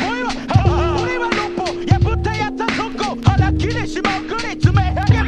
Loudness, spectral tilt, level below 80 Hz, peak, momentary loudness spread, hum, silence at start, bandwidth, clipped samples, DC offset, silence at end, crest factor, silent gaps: -18 LUFS; -6.5 dB/octave; -26 dBFS; 0 dBFS; 6 LU; none; 0 s; 9.4 kHz; under 0.1%; under 0.1%; 0 s; 16 dB; none